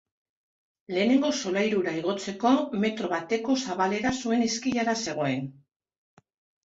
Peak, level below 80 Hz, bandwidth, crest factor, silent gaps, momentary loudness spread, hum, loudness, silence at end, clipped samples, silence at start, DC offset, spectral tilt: -10 dBFS; -64 dBFS; 8 kHz; 16 dB; none; 6 LU; none; -27 LUFS; 1.15 s; under 0.1%; 0.9 s; under 0.1%; -4.5 dB/octave